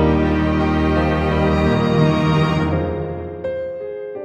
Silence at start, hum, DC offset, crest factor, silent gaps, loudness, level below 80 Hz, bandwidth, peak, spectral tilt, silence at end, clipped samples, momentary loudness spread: 0 s; none; under 0.1%; 14 dB; none; -18 LUFS; -28 dBFS; 8 kHz; -2 dBFS; -8 dB/octave; 0 s; under 0.1%; 11 LU